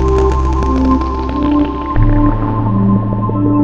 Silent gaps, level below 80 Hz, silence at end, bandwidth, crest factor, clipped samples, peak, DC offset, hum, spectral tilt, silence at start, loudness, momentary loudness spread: none; -18 dBFS; 0 s; 7.4 kHz; 12 dB; under 0.1%; 0 dBFS; under 0.1%; none; -9 dB/octave; 0 s; -14 LUFS; 4 LU